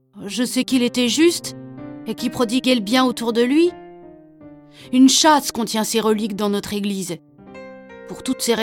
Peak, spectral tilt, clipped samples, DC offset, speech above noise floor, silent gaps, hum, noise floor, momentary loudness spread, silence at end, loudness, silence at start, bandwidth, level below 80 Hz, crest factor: -2 dBFS; -3 dB/octave; under 0.1%; under 0.1%; 25 dB; none; none; -43 dBFS; 21 LU; 0 s; -18 LUFS; 0.15 s; 17.5 kHz; -58 dBFS; 18 dB